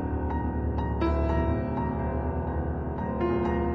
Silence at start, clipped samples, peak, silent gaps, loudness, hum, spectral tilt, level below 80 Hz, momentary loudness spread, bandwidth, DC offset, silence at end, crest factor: 0 s; under 0.1%; -14 dBFS; none; -29 LUFS; none; -10 dB/octave; -32 dBFS; 4 LU; 5 kHz; 0.1%; 0 s; 14 dB